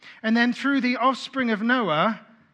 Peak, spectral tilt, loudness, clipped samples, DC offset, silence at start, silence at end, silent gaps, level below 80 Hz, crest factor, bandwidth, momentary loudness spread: -6 dBFS; -5.5 dB/octave; -23 LUFS; under 0.1%; under 0.1%; 0.05 s; 0.35 s; none; -78 dBFS; 18 dB; 9 kHz; 4 LU